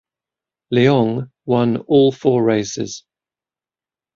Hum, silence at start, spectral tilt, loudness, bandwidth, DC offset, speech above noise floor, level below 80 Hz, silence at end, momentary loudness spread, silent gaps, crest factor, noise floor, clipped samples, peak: none; 0.7 s; -6.5 dB/octave; -17 LUFS; 7.6 kHz; under 0.1%; over 74 dB; -58 dBFS; 1.15 s; 12 LU; none; 16 dB; under -90 dBFS; under 0.1%; -2 dBFS